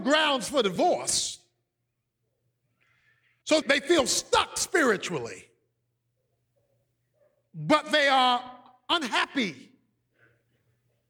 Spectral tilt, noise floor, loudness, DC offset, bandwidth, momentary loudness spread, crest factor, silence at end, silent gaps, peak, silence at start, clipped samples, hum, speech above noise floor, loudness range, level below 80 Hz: -2 dB/octave; -81 dBFS; -25 LUFS; under 0.1%; 19 kHz; 14 LU; 20 dB; 1.5 s; none; -8 dBFS; 0 s; under 0.1%; none; 55 dB; 4 LU; -64 dBFS